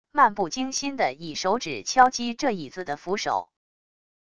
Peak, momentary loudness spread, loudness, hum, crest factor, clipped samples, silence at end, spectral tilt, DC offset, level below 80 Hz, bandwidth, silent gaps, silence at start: -4 dBFS; 10 LU; -25 LUFS; none; 22 dB; under 0.1%; 0.65 s; -3 dB/octave; 0.3%; -62 dBFS; 11 kHz; none; 0.05 s